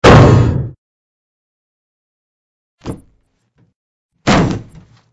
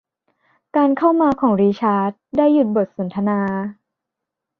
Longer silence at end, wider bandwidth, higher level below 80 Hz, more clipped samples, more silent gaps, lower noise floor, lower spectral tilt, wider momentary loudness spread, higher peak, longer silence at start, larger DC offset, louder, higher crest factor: second, 0.5 s vs 0.85 s; first, 10.5 kHz vs 6 kHz; first, -28 dBFS vs -58 dBFS; first, 0.6% vs under 0.1%; first, 0.78-2.78 s, 3.76-4.09 s vs none; second, -59 dBFS vs -82 dBFS; second, -6.5 dB/octave vs -9.5 dB/octave; first, 24 LU vs 8 LU; first, 0 dBFS vs -4 dBFS; second, 0 s vs 0.75 s; neither; first, -11 LUFS vs -18 LUFS; about the same, 14 dB vs 16 dB